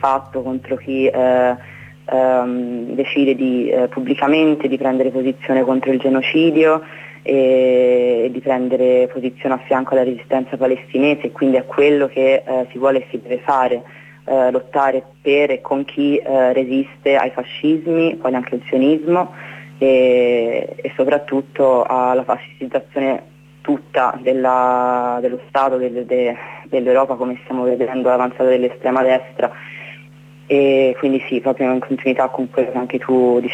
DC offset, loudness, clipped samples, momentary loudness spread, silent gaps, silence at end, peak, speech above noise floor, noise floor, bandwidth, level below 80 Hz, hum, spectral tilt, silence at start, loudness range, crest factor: under 0.1%; -17 LUFS; under 0.1%; 9 LU; none; 0 s; -4 dBFS; 25 dB; -42 dBFS; 8 kHz; -64 dBFS; none; -7 dB/octave; 0 s; 3 LU; 12 dB